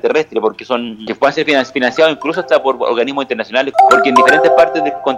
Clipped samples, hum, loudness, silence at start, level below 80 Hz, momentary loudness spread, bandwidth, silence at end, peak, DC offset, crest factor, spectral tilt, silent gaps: 0.2%; none; -12 LUFS; 0.05 s; -56 dBFS; 10 LU; 14 kHz; 0 s; 0 dBFS; under 0.1%; 12 dB; -4 dB/octave; none